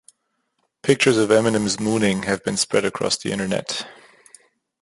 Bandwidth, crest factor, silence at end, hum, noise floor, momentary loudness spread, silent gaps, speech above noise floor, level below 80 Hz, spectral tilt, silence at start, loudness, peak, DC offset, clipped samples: 11.5 kHz; 20 dB; 0.9 s; none; -72 dBFS; 10 LU; none; 52 dB; -56 dBFS; -4 dB/octave; 0.85 s; -20 LUFS; -2 dBFS; under 0.1%; under 0.1%